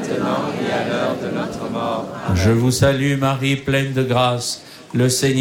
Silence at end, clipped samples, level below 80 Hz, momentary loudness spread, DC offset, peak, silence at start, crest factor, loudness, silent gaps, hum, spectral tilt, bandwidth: 0 s; under 0.1%; -44 dBFS; 9 LU; under 0.1%; -4 dBFS; 0 s; 16 dB; -19 LUFS; none; none; -5 dB/octave; 17 kHz